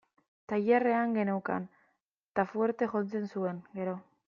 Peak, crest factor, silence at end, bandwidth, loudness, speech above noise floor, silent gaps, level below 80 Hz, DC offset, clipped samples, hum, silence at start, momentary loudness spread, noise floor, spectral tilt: -14 dBFS; 18 dB; 0.25 s; 6.8 kHz; -32 LUFS; 47 dB; 2.02-2.35 s; -76 dBFS; under 0.1%; under 0.1%; none; 0.5 s; 11 LU; -78 dBFS; -9 dB/octave